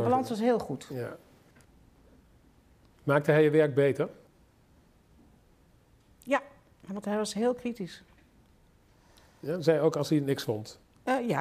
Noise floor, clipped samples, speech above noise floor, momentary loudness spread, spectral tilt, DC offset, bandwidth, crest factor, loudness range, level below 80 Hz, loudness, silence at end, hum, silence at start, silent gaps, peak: -62 dBFS; under 0.1%; 34 dB; 18 LU; -6.5 dB/octave; under 0.1%; 15.5 kHz; 22 dB; 7 LU; -66 dBFS; -29 LUFS; 0 s; none; 0 s; none; -10 dBFS